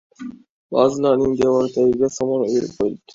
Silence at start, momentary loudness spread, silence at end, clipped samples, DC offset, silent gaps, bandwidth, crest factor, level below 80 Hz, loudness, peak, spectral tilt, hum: 0.2 s; 12 LU; 0.2 s; under 0.1%; under 0.1%; 0.49-0.69 s; 7.8 kHz; 18 dB; -52 dBFS; -19 LUFS; -2 dBFS; -6 dB/octave; none